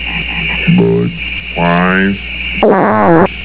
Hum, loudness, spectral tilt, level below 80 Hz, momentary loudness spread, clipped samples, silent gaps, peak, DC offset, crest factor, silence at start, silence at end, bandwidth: none; -11 LUFS; -10.5 dB/octave; -30 dBFS; 8 LU; 0.3%; none; 0 dBFS; 1%; 12 dB; 0 s; 0 s; 4 kHz